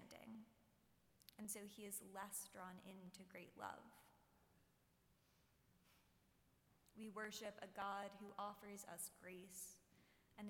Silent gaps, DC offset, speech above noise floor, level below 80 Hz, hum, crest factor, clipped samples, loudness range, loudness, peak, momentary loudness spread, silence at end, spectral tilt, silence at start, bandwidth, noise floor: none; under 0.1%; 24 dB; -86 dBFS; none; 20 dB; under 0.1%; 10 LU; -54 LUFS; -36 dBFS; 11 LU; 0 s; -3 dB/octave; 0 s; 17.5 kHz; -79 dBFS